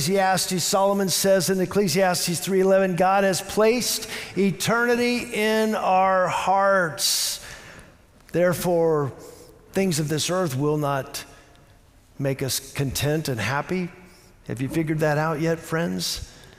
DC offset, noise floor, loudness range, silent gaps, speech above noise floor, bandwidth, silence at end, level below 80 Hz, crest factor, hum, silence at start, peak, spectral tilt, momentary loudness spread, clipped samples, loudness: under 0.1%; -53 dBFS; 6 LU; none; 31 dB; 16 kHz; 0.1 s; -52 dBFS; 14 dB; none; 0 s; -10 dBFS; -4 dB/octave; 10 LU; under 0.1%; -22 LUFS